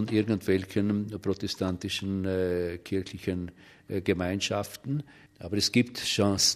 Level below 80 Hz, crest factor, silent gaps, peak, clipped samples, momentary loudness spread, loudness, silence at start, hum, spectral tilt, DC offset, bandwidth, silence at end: -58 dBFS; 20 dB; none; -8 dBFS; under 0.1%; 9 LU; -29 LUFS; 0 s; none; -4.5 dB/octave; under 0.1%; 15 kHz; 0 s